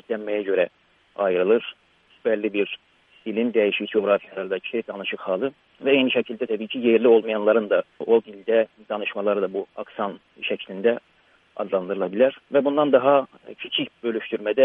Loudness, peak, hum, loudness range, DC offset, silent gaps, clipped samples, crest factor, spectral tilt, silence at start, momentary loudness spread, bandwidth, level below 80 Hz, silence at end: -23 LUFS; -2 dBFS; none; 5 LU; under 0.1%; none; under 0.1%; 20 dB; -8 dB/octave; 0.1 s; 12 LU; 3.8 kHz; -74 dBFS; 0 s